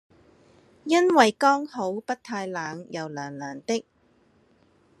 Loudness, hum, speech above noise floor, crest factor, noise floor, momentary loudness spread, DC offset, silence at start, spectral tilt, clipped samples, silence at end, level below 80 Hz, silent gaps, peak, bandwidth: -25 LUFS; none; 38 dB; 24 dB; -62 dBFS; 16 LU; under 0.1%; 0.85 s; -4 dB/octave; under 0.1%; 1.2 s; -76 dBFS; none; -2 dBFS; 12.5 kHz